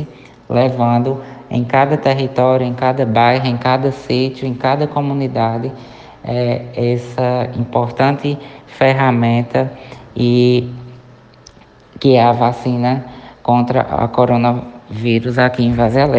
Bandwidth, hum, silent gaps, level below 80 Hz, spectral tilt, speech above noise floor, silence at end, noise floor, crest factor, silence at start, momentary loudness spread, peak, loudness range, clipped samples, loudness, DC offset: 7.6 kHz; none; none; -46 dBFS; -8 dB/octave; 29 dB; 0 s; -43 dBFS; 16 dB; 0 s; 11 LU; 0 dBFS; 3 LU; under 0.1%; -15 LUFS; under 0.1%